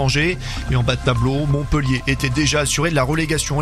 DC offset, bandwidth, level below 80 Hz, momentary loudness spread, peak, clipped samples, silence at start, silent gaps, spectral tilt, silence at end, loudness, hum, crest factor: under 0.1%; 14 kHz; -30 dBFS; 3 LU; -2 dBFS; under 0.1%; 0 s; none; -4.5 dB/octave; 0 s; -19 LUFS; none; 16 dB